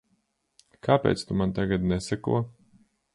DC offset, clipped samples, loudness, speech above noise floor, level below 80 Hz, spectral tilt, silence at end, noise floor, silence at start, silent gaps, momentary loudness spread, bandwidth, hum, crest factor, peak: under 0.1%; under 0.1%; -27 LUFS; 47 dB; -48 dBFS; -6.5 dB/octave; 0.65 s; -72 dBFS; 0.85 s; none; 6 LU; 11.5 kHz; none; 22 dB; -6 dBFS